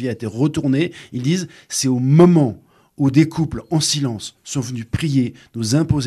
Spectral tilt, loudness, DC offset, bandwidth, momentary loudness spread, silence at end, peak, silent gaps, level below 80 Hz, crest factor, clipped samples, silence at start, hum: -5.5 dB/octave; -18 LUFS; under 0.1%; 13 kHz; 13 LU; 0 s; -2 dBFS; none; -46 dBFS; 16 dB; under 0.1%; 0 s; none